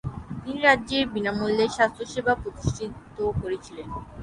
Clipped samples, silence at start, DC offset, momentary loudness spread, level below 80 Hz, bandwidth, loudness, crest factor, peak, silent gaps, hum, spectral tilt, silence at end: under 0.1%; 0.05 s; under 0.1%; 16 LU; -44 dBFS; 11.5 kHz; -25 LUFS; 22 dB; -4 dBFS; none; none; -5 dB/octave; 0 s